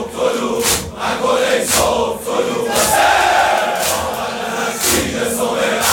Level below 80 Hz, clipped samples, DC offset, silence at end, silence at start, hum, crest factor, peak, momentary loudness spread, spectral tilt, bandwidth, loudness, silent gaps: -40 dBFS; under 0.1%; under 0.1%; 0 s; 0 s; none; 16 dB; 0 dBFS; 7 LU; -2 dB/octave; 19 kHz; -15 LUFS; none